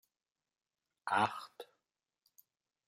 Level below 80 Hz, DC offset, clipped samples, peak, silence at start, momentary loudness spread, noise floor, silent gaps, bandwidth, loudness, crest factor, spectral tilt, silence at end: -90 dBFS; under 0.1%; under 0.1%; -18 dBFS; 1.05 s; 22 LU; under -90 dBFS; none; 16 kHz; -36 LUFS; 26 dB; -4 dB/octave; 1.25 s